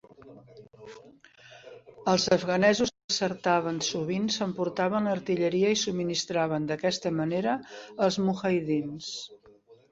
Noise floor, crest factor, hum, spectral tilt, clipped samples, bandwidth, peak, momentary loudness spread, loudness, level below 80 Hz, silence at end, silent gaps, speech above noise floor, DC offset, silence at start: -57 dBFS; 20 dB; none; -4.5 dB/octave; under 0.1%; 8 kHz; -10 dBFS; 13 LU; -27 LUFS; -66 dBFS; 0.2 s; 3.04-3.08 s; 30 dB; under 0.1%; 0.25 s